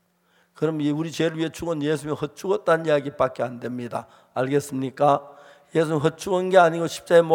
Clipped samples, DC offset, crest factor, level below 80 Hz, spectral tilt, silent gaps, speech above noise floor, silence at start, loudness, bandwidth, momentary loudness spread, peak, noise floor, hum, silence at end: under 0.1%; under 0.1%; 20 dB; -62 dBFS; -6 dB/octave; none; 42 dB; 0.6 s; -23 LUFS; 17 kHz; 11 LU; -2 dBFS; -64 dBFS; none; 0 s